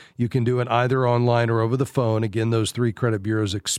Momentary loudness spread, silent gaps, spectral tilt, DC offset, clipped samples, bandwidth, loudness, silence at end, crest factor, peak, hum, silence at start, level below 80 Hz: 4 LU; none; -6 dB/octave; under 0.1%; under 0.1%; 13.5 kHz; -22 LUFS; 0 s; 18 dB; -4 dBFS; none; 0 s; -58 dBFS